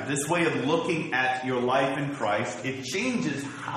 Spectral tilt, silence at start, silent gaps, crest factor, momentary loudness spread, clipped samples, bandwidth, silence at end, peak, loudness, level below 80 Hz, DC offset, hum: -4.5 dB/octave; 0 s; none; 16 dB; 6 LU; under 0.1%; 13 kHz; 0 s; -10 dBFS; -27 LUFS; -66 dBFS; under 0.1%; none